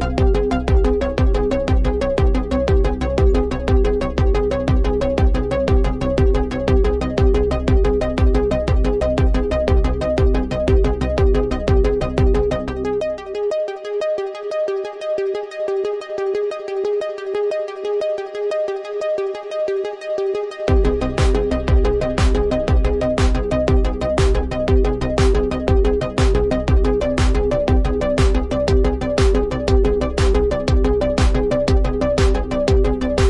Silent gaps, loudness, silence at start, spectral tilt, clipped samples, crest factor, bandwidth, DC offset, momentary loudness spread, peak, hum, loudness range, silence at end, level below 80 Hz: none; -19 LUFS; 0 s; -7 dB/octave; under 0.1%; 12 dB; 11 kHz; under 0.1%; 6 LU; -4 dBFS; none; 5 LU; 0 s; -20 dBFS